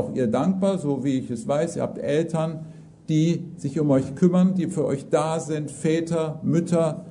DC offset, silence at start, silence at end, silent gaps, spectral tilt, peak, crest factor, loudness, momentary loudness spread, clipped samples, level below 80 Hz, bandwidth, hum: under 0.1%; 0 s; 0 s; none; -7.5 dB/octave; -6 dBFS; 16 dB; -24 LUFS; 7 LU; under 0.1%; -62 dBFS; 11 kHz; none